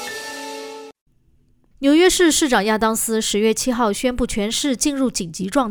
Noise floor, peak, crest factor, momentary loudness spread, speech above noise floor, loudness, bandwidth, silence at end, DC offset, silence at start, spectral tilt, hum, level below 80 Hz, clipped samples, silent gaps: -57 dBFS; -2 dBFS; 16 dB; 16 LU; 39 dB; -18 LUFS; over 20 kHz; 0 s; under 0.1%; 0 s; -3 dB/octave; none; -42 dBFS; under 0.1%; 1.01-1.06 s